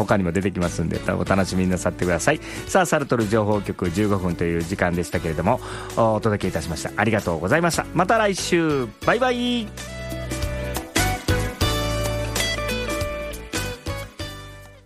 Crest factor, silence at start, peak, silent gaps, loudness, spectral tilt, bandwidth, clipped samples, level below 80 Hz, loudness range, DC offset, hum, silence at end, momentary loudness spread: 18 dB; 0 s; -4 dBFS; none; -23 LUFS; -5 dB/octave; 15.5 kHz; under 0.1%; -36 dBFS; 3 LU; under 0.1%; none; 0.05 s; 9 LU